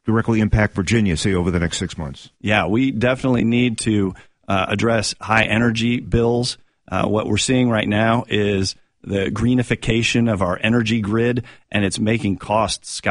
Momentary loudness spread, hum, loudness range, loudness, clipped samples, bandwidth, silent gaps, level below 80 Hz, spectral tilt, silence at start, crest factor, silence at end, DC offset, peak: 8 LU; none; 1 LU; -19 LUFS; under 0.1%; 11 kHz; none; -38 dBFS; -5.5 dB/octave; 0.05 s; 16 dB; 0 s; under 0.1%; -2 dBFS